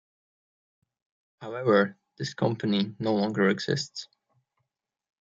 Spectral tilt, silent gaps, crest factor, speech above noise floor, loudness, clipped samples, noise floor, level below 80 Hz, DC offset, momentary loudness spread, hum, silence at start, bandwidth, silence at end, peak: -5.5 dB/octave; none; 20 dB; 55 dB; -27 LUFS; under 0.1%; -82 dBFS; -72 dBFS; under 0.1%; 14 LU; none; 1.4 s; 7.8 kHz; 1.15 s; -8 dBFS